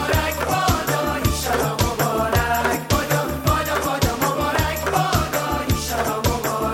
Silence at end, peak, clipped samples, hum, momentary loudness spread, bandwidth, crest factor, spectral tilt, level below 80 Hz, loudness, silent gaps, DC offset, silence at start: 0 s; -4 dBFS; under 0.1%; none; 3 LU; 17 kHz; 16 dB; -4.5 dB/octave; -32 dBFS; -21 LUFS; none; under 0.1%; 0 s